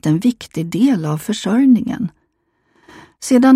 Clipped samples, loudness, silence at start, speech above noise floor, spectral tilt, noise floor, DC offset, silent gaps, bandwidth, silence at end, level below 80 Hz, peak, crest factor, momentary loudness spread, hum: under 0.1%; -17 LUFS; 0.05 s; 51 dB; -6 dB/octave; -65 dBFS; under 0.1%; none; 15 kHz; 0 s; -56 dBFS; 0 dBFS; 14 dB; 12 LU; none